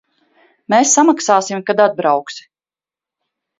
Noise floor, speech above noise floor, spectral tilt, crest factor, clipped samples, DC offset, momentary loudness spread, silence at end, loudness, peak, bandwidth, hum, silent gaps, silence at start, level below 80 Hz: under -90 dBFS; over 76 dB; -3 dB/octave; 16 dB; under 0.1%; under 0.1%; 10 LU; 1.2 s; -14 LUFS; 0 dBFS; 7.8 kHz; none; none; 0.7 s; -68 dBFS